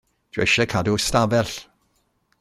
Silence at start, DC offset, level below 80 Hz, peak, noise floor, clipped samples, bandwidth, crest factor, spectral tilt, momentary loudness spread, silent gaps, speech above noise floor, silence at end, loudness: 0.35 s; under 0.1%; -46 dBFS; -4 dBFS; -67 dBFS; under 0.1%; 15.5 kHz; 20 dB; -4 dB/octave; 12 LU; none; 47 dB; 0.75 s; -20 LUFS